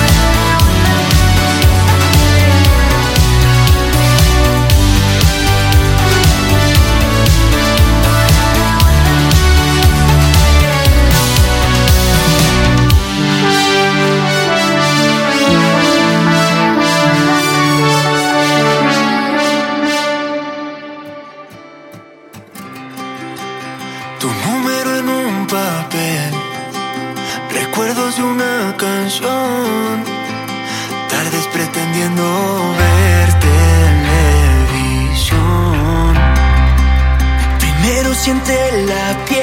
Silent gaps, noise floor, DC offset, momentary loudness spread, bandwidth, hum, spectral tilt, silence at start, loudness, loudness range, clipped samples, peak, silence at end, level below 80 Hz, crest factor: none; -37 dBFS; under 0.1%; 11 LU; 17 kHz; none; -4.5 dB/octave; 0 s; -12 LUFS; 8 LU; under 0.1%; 0 dBFS; 0 s; -16 dBFS; 12 dB